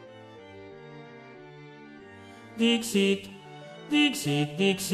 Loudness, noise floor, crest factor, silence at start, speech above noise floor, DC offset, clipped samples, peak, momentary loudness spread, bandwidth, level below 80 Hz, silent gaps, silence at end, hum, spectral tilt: -26 LUFS; -48 dBFS; 18 dB; 0 s; 22 dB; under 0.1%; under 0.1%; -12 dBFS; 23 LU; 14 kHz; -70 dBFS; none; 0 s; none; -4 dB/octave